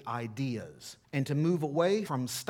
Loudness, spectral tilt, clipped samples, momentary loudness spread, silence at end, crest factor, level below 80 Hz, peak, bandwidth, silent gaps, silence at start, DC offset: -32 LUFS; -6 dB/octave; under 0.1%; 11 LU; 0.05 s; 18 dB; -74 dBFS; -14 dBFS; 18 kHz; none; 0 s; under 0.1%